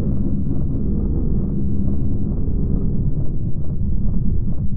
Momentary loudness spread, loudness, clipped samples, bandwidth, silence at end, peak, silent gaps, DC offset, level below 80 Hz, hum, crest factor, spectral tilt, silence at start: 3 LU; -23 LUFS; under 0.1%; 1.5 kHz; 0 s; -4 dBFS; none; under 0.1%; -22 dBFS; none; 12 dB; -16.5 dB/octave; 0 s